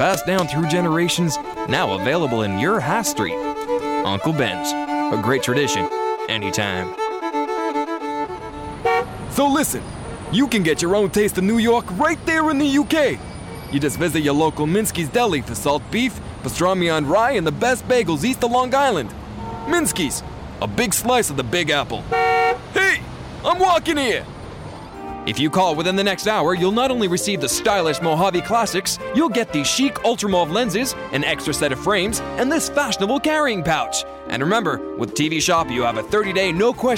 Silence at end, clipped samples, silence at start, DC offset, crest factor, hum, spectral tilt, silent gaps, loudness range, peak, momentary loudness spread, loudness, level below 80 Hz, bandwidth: 0 s; under 0.1%; 0 s; under 0.1%; 14 dB; none; -4 dB/octave; none; 2 LU; -4 dBFS; 8 LU; -20 LUFS; -44 dBFS; 16.5 kHz